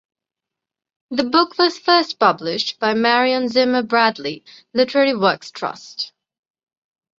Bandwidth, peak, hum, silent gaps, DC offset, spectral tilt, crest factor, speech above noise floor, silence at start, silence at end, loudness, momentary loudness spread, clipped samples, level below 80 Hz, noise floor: 7.6 kHz; -2 dBFS; none; none; under 0.1%; -4 dB/octave; 18 dB; 67 dB; 1.1 s; 1.1 s; -18 LUFS; 13 LU; under 0.1%; -66 dBFS; -85 dBFS